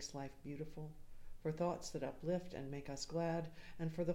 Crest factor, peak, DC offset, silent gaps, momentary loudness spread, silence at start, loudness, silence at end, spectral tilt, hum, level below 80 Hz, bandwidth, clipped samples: 18 dB; -26 dBFS; under 0.1%; none; 11 LU; 0 s; -44 LUFS; 0 s; -6 dB/octave; none; -58 dBFS; 16 kHz; under 0.1%